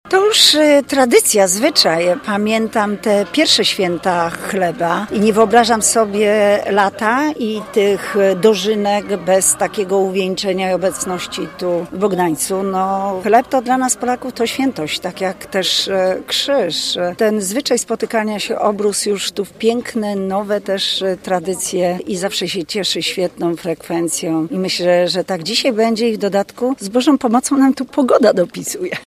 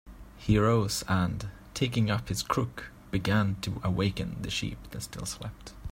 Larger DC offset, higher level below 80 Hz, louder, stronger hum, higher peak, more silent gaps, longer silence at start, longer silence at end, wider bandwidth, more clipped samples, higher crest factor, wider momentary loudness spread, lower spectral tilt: neither; second, -54 dBFS vs -46 dBFS; first, -15 LUFS vs -30 LUFS; neither; first, 0 dBFS vs -10 dBFS; neither; about the same, 0.05 s vs 0.05 s; about the same, 0 s vs 0 s; about the same, 15.5 kHz vs 16 kHz; neither; about the same, 16 dB vs 20 dB; second, 8 LU vs 14 LU; second, -3 dB/octave vs -5.5 dB/octave